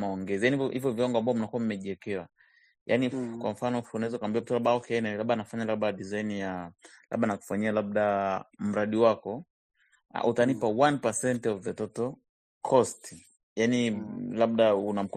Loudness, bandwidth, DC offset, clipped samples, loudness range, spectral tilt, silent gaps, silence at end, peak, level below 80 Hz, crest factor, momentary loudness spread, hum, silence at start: -29 LUFS; 13.5 kHz; under 0.1%; under 0.1%; 3 LU; -5.5 dB/octave; 2.81-2.86 s, 9.50-9.70 s, 12.29-12.61 s, 13.43-13.56 s; 0 s; -8 dBFS; -70 dBFS; 20 dB; 11 LU; none; 0 s